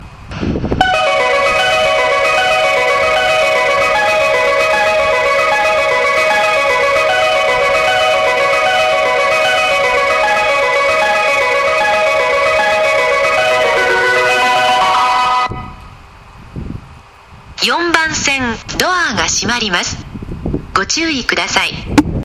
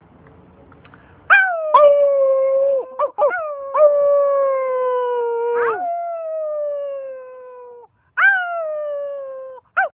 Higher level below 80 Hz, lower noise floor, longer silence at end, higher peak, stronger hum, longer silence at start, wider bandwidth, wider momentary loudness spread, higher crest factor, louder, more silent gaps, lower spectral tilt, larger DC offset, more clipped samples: first, -36 dBFS vs -64 dBFS; second, -38 dBFS vs -47 dBFS; about the same, 0 s vs 0.1 s; about the same, 0 dBFS vs 0 dBFS; neither; second, 0 s vs 1.3 s; first, 15 kHz vs 3.8 kHz; second, 7 LU vs 17 LU; about the same, 14 dB vs 18 dB; first, -12 LUFS vs -17 LUFS; neither; second, -2.5 dB/octave vs -5.5 dB/octave; neither; neither